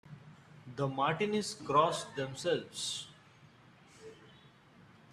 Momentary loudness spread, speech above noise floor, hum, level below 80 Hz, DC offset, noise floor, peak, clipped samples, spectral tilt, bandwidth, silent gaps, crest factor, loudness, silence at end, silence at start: 25 LU; 27 dB; none; -74 dBFS; under 0.1%; -60 dBFS; -14 dBFS; under 0.1%; -4 dB/octave; 14 kHz; none; 22 dB; -34 LUFS; 0.8 s; 0.05 s